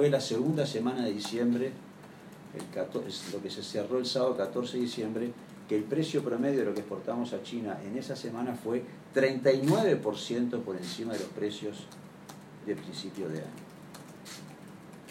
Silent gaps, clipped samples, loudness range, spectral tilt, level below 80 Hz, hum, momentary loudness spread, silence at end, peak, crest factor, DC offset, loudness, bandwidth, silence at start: none; under 0.1%; 9 LU; -5.5 dB/octave; -76 dBFS; none; 20 LU; 0 s; -12 dBFS; 20 dB; under 0.1%; -32 LUFS; 16 kHz; 0 s